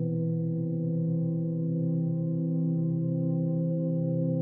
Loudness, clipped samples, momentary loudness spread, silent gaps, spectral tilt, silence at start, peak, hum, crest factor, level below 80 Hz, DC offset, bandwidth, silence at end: -29 LUFS; under 0.1%; 2 LU; none; -16.5 dB/octave; 0 s; -18 dBFS; none; 10 dB; -82 dBFS; under 0.1%; 1.1 kHz; 0 s